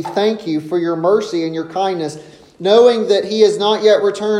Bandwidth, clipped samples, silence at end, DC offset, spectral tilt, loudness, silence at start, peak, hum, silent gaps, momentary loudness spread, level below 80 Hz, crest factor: 10.5 kHz; under 0.1%; 0 s; under 0.1%; -5 dB/octave; -15 LUFS; 0 s; 0 dBFS; none; none; 11 LU; -64 dBFS; 14 dB